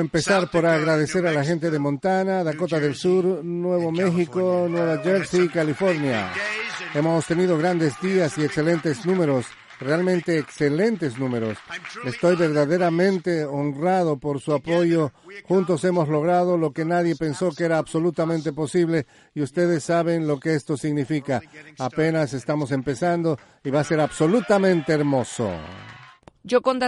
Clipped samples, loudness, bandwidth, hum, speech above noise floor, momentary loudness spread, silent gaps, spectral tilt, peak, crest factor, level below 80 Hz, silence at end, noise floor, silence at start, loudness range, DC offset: under 0.1%; -22 LUFS; 11.5 kHz; none; 26 dB; 7 LU; none; -6.5 dB/octave; -4 dBFS; 16 dB; -58 dBFS; 0 s; -47 dBFS; 0 s; 2 LU; under 0.1%